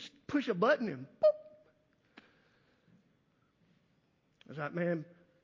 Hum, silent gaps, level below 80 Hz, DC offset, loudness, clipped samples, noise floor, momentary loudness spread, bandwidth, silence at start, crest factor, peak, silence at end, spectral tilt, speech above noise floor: none; none; -78 dBFS; under 0.1%; -33 LUFS; under 0.1%; -74 dBFS; 15 LU; 7.4 kHz; 0 s; 20 dB; -18 dBFS; 0.4 s; -7 dB/octave; 40 dB